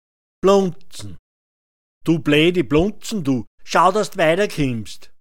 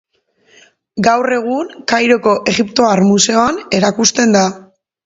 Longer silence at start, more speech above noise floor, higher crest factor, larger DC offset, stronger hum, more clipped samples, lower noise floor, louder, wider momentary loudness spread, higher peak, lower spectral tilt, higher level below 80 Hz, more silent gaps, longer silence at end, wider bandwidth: second, 0.4 s vs 0.95 s; first, over 72 dB vs 42 dB; about the same, 18 dB vs 14 dB; first, 2% vs under 0.1%; neither; neither; first, under -90 dBFS vs -54 dBFS; second, -18 LUFS vs -13 LUFS; first, 20 LU vs 7 LU; about the same, -2 dBFS vs 0 dBFS; first, -5.5 dB/octave vs -3.5 dB/octave; first, -42 dBFS vs -52 dBFS; first, 1.19-2.01 s, 3.47-3.58 s vs none; second, 0 s vs 0.45 s; first, 17 kHz vs 8 kHz